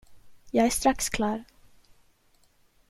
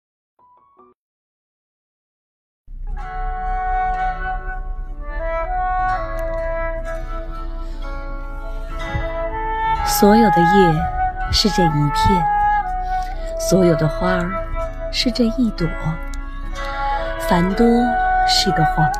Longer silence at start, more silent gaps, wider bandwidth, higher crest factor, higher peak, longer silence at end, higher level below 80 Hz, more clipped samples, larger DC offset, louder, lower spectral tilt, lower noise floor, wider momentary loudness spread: second, 0.1 s vs 2.7 s; neither; about the same, 16 kHz vs 15.5 kHz; about the same, 20 dB vs 18 dB; second, -10 dBFS vs 0 dBFS; first, 1.45 s vs 0 s; second, -48 dBFS vs -28 dBFS; neither; neither; second, -26 LUFS vs -19 LUFS; second, -3.5 dB/octave vs -5 dB/octave; first, -63 dBFS vs -52 dBFS; second, 7 LU vs 17 LU